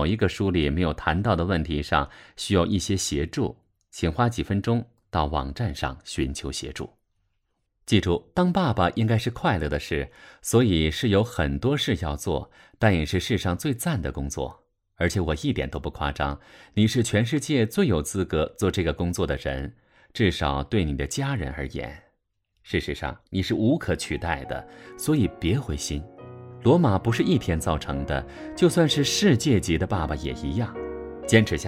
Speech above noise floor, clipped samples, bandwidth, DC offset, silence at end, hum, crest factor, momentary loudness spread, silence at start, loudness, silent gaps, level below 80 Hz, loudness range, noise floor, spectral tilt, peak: 50 dB; under 0.1%; 16 kHz; under 0.1%; 0 s; none; 20 dB; 12 LU; 0 s; -25 LUFS; none; -38 dBFS; 5 LU; -74 dBFS; -5.5 dB/octave; -4 dBFS